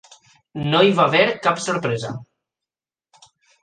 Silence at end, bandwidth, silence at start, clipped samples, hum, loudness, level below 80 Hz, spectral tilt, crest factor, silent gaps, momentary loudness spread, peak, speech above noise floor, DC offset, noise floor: 1.4 s; 9.6 kHz; 0.55 s; under 0.1%; none; -18 LUFS; -60 dBFS; -5 dB/octave; 20 dB; none; 17 LU; -2 dBFS; 71 dB; under 0.1%; -89 dBFS